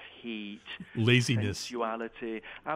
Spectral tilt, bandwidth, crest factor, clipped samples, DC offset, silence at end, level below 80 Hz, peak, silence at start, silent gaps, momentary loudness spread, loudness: -5 dB/octave; 14 kHz; 20 dB; under 0.1%; under 0.1%; 0 s; -62 dBFS; -10 dBFS; 0 s; none; 15 LU; -31 LUFS